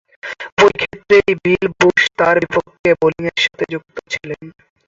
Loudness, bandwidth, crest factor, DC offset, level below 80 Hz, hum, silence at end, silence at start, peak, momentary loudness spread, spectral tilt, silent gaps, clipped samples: -15 LUFS; 7.8 kHz; 16 dB; under 0.1%; -50 dBFS; none; 0.4 s; 0.25 s; 0 dBFS; 14 LU; -4.5 dB/octave; 0.52-0.57 s, 2.79-2.84 s; under 0.1%